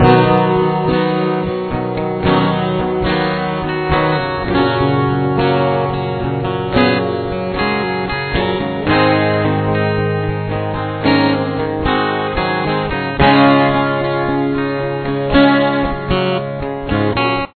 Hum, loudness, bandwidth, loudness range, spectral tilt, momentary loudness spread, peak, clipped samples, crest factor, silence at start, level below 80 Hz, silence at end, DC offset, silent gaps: none; -16 LUFS; 4.6 kHz; 3 LU; -9.5 dB/octave; 8 LU; 0 dBFS; under 0.1%; 14 dB; 0 s; -34 dBFS; 0.1 s; under 0.1%; none